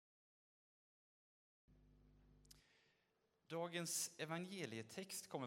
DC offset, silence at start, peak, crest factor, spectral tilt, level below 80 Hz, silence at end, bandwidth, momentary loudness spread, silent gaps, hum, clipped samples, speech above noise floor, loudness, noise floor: under 0.1%; 1.7 s; -32 dBFS; 22 dB; -3 dB/octave; -82 dBFS; 0 s; 16 kHz; 7 LU; none; none; under 0.1%; 36 dB; -47 LUFS; -84 dBFS